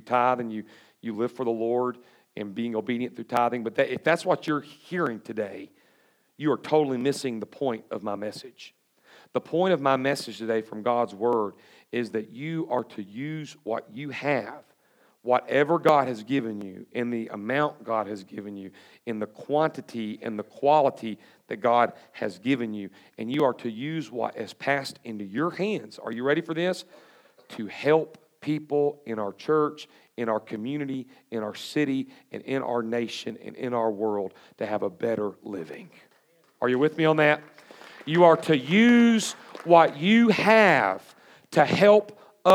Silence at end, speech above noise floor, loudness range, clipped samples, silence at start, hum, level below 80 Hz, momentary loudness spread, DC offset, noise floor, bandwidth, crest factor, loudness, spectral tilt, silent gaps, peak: 0 s; 39 dB; 10 LU; under 0.1%; 0.05 s; none; -82 dBFS; 18 LU; under 0.1%; -64 dBFS; 16 kHz; 22 dB; -26 LUFS; -5.5 dB/octave; none; -4 dBFS